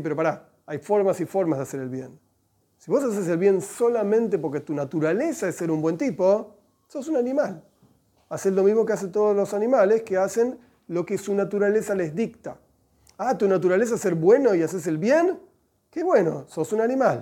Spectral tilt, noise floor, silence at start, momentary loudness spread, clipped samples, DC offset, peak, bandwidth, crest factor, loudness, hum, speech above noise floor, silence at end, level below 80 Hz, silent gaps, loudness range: -6.5 dB/octave; -67 dBFS; 0 s; 13 LU; under 0.1%; under 0.1%; -6 dBFS; 16.5 kHz; 18 dB; -23 LUFS; none; 45 dB; 0 s; -70 dBFS; none; 4 LU